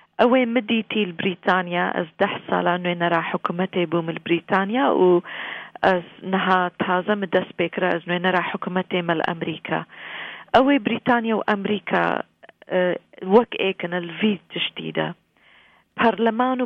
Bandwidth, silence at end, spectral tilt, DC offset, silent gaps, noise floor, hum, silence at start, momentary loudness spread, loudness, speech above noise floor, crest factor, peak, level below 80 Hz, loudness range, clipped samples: 6.4 kHz; 0 s; -8 dB/octave; under 0.1%; none; -55 dBFS; none; 0.2 s; 9 LU; -22 LUFS; 34 dB; 18 dB; -4 dBFS; -62 dBFS; 2 LU; under 0.1%